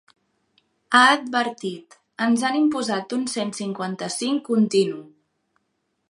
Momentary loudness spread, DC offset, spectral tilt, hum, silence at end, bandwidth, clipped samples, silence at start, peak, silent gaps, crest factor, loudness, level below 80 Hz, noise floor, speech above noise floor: 13 LU; under 0.1%; -3.5 dB/octave; none; 1.05 s; 11.5 kHz; under 0.1%; 0.9 s; -2 dBFS; none; 22 dB; -22 LUFS; -74 dBFS; -74 dBFS; 52 dB